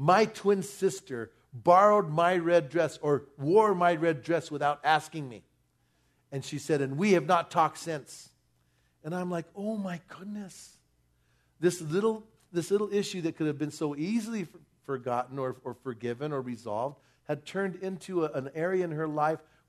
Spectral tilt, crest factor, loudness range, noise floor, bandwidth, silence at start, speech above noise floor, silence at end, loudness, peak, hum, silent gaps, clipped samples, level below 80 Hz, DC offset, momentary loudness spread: -6 dB/octave; 22 dB; 10 LU; -71 dBFS; 13.5 kHz; 0 s; 42 dB; 0.3 s; -29 LUFS; -8 dBFS; none; none; under 0.1%; -74 dBFS; under 0.1%; 16 LU